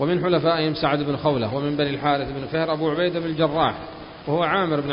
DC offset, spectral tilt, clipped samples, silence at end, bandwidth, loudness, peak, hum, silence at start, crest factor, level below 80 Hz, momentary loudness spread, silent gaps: under 0.1%; -11 dB/octave; under 0.1%; 0 s; 5.4 kHz; -22 LUFS; -6 dBFS; none; 0 s; 16 dB; -50 dBFS; 6 LU; none